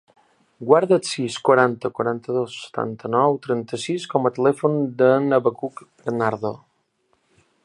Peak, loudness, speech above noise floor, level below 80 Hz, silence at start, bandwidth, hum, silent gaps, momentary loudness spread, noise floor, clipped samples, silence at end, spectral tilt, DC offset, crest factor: -2 dBFS; -21 LUFS; 47 dB; -68 dBFS; 0.6 s; 11.5 kHz; none; none; 12 LU; -67 dBFS; under 0.1%; 1.05 s; -6 dB/octave; under 0.1%; 20 dB